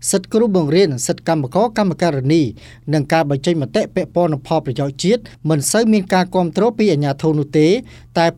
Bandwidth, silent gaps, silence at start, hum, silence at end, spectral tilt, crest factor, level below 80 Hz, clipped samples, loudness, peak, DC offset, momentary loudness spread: 15 kHz; none; 0 s; none; 0.05 s; -5.5 dB/octave; 14 dB; -50 dBFS; under 0.1%; -17 LUFS; -2 dBFS; under 0.1%; 6 LU